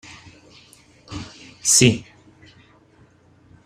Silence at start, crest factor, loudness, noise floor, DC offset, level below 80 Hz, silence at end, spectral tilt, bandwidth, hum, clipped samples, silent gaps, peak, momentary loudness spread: 0.1 s; 22 dB; -16 LUFS; -54 dBFS; under 0.1%; -54 dBFS; 1.65 s; -3 dB/octave; 14.5 kHz; none; under 0.1%; none; -2 dBFS; 25 LU